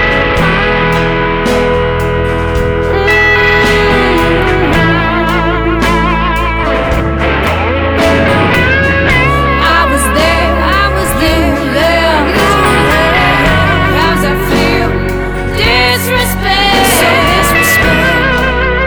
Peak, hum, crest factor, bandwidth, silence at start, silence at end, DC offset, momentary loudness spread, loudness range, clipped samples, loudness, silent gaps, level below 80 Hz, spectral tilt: 0 dBFS; none; 8 dB; over 20 kHz; 0 s; 0 s; under 0.1%; 5 LU; 2 LU; under 0.1%; -9 LUFS; none; -18 dBFS; -4.5 dB/octave